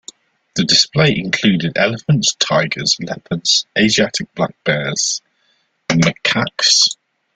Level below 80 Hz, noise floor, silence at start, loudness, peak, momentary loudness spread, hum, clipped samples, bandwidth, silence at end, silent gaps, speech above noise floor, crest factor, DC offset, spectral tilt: -52 dBFS; -62 dBFS; 0.55 s; -15 LUFS; 0 dBFS; 8 LU; none; under 0.1%; 9.6 kHz; 0.4 s; none; 46 dB; 16 dB; under 0.1%; -3 dB/octave